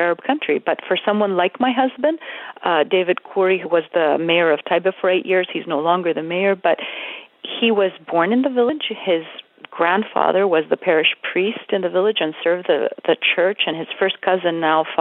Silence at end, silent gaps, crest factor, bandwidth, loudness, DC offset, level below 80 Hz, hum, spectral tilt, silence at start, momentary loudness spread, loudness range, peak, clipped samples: 0 s; none; 18 dB; 4.1 kHz; -19 LUFS; under 0.1%; -82 dBFS; none; -8.5 dB/octave; 0 s; 6 LU; 2 LU; -2 dBFS; under 0.1%